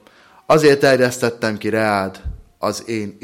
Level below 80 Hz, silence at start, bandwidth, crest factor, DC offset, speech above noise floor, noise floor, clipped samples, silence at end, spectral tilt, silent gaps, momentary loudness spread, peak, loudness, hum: -40 dBFS; 0.5 s; 16.5 kHz; 16 dB; under 0.1%; 27 dB; -43 dBFS; under 0.1%; 0.15 s; -5 dB/octave; none; 14 LU; -2 dBFS; -17 LUFS; none